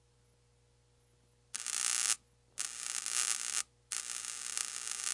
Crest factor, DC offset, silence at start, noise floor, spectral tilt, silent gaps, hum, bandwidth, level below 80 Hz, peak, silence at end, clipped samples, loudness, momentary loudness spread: 30 dB; under 0.1%; 1.55 s; -69 dBFS; 3 dB/octave; none; 60 Hz at -75 dBFS; 11.5 kHz; -76 dBFS; -10 dBFS; 0 s; under 0.1%; -35 LUFS; 9 LU